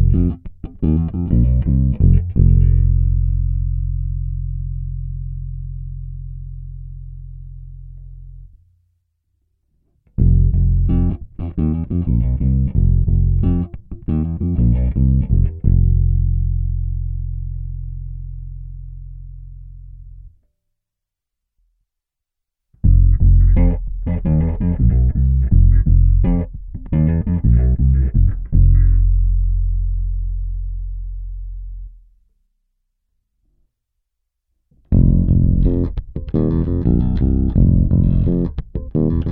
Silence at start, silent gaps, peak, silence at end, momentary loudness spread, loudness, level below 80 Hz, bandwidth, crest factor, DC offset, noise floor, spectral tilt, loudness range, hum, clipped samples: 0 s; none; 0 dBFS; 0 s; 19 LU; -18 LUFS; -18 dBFS; 2.3 kHz; 16 dB; under 0.1%; -82 dBFS; -14 dB/octave; 17 LU; none; under 0.1%